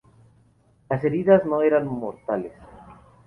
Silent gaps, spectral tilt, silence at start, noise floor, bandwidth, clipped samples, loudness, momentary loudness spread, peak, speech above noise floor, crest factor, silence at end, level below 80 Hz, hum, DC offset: none; -10 dB/octave; 0.9 s; -59 dBFS; 3.3 kHz; under 0.1%; -22 LUFS; 12 LU; -4 dBFS; 38 dB; 20 dB; 0.35 s; -58 dBFS; none; under 0.1%